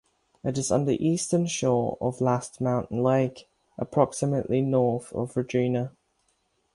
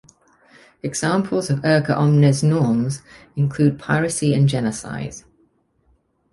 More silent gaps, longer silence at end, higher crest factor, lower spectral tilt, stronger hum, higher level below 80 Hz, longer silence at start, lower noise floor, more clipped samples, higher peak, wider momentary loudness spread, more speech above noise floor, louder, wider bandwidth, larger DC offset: neither; second, 0.85 s vs 1.15 s; about the same, 20 dB vs 16 dB; about the same, -6 dB/octave vs -6 dB/octave; neither; second, -58 dBFS vs -52 dBFS; second, 0.45 s vs 0.85 s; first, -71 dBFS vs -62 dBFS; neither; about the same, -6 dBFS vs -4 dBFS; second, 7 LU vs 15 LU; about the same, 46 dB vs 43 dB; second, -26 LUFS vs -19 LUFS; about the same, 11.5 kHz vs 11.5 kHz; neither